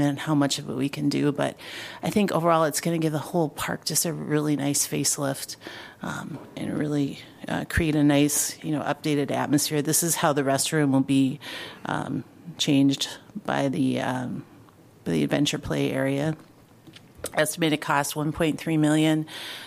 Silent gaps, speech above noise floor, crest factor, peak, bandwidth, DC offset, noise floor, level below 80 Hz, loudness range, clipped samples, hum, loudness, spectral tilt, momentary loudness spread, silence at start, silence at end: none; 27 dB; 18 dB; -6 dBFS; 15.5 kHz; under 0.1%; -52 dBFS; -52 dBFS; 4 LU; under 0.1%; none; -25 LUFS; -4.5 dB/octave; 13 LU; 0 s; 0 s